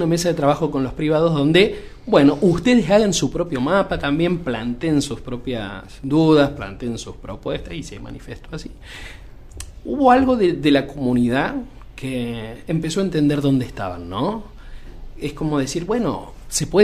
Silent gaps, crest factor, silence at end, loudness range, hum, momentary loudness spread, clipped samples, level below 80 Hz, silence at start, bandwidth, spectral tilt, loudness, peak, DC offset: none; 18 dB; 0 s; 7 LU; none; 19 LU; under 0.1%; -38 dBFS; 0 s; 15 kHz; -5.5 dB/octave; -19 LUFS; 0 dBFS; under 0.1%